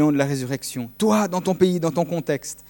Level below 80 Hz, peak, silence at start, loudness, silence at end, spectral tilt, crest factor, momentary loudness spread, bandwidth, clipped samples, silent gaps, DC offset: -58 dBFS; -4 dBFS; 0 s; -22 LUFS; 0.1 s; -6 dB/octave; 18 dB; 8 LU; 17.5 kHz; under 0.1%; none; under 0.1%